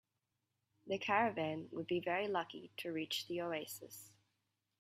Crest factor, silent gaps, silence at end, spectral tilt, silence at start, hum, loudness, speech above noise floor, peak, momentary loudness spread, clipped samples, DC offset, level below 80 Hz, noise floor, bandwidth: 22 dB; none; 0.7 s; -4 dB/octave; 0.85 s; none; -40 LUFS; 48 dB; -18 dBFS; 14 LU; under 0.1%; under 0.1%; -84 dBFS; -88 dBFS; 16 kHz